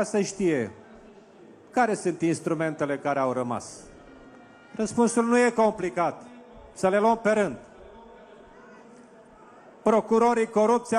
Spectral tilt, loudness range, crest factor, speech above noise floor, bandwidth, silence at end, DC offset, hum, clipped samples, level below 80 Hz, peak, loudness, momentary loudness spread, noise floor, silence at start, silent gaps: -5.5 dB/octave; 4 LU; 18 dB; 27 dB; 11.5 kHz; 0 s; under 0.1%; none; under 0.1%; -62 dBFS; -8 dBFS; -25 LUFS; 13 LU; -51 dBFS; 0 s; none